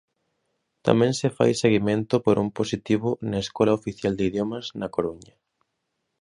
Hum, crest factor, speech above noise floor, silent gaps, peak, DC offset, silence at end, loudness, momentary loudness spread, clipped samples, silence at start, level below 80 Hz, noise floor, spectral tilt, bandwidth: none; 22 dB; 55 dB; none; -2 dBFS; under 0.1%; 0.95 s; -24 LUFS; 8 LU; under 0.1%; 0.85 s; -54 dBFS; -78 dBFS; -6 dB/octave; 11 kHz